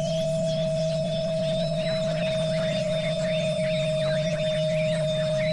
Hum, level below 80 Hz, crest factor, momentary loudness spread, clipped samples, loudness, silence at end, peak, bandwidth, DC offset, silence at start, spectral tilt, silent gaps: none; -48 dBFS; 10 dB; 1 LU; under 0.1%; -26 LUFS; 0 s; -16 dBFS; 11.5 kHz; under 0.1%; 0 s; -6 dB/octave; none